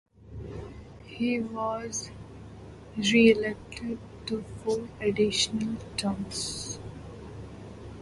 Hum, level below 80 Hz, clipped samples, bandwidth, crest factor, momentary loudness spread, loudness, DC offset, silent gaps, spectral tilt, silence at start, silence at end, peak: none; -52 dBFS; under 0.1%; 11.5 kHz; 22 dB; 21 LU; -28 LUFS; under 0.1%; none; -4 dB/octave; 0.2 s; 0 s; -8 dBFS